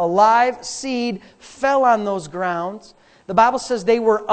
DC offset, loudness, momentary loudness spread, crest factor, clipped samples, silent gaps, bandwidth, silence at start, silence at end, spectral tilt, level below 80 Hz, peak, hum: under 0.1%; -18 LUFS; 12 LU; 16 dB; under 0.1%; none; 9 kHz; 0 s; 0 s; -4.5 dB/octave; -56 dBFS; -2 dBFS; none